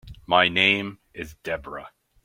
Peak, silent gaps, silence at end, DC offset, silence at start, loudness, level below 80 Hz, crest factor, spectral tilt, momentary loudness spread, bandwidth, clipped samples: -2 dBFS; none; 0.35 s; under 0.1%; 0.05 s; -21 LUFS; -52 dBFS; 24 dB; -4.5 dB/octave; 20 LU; 16.5 kHz; under 0.1%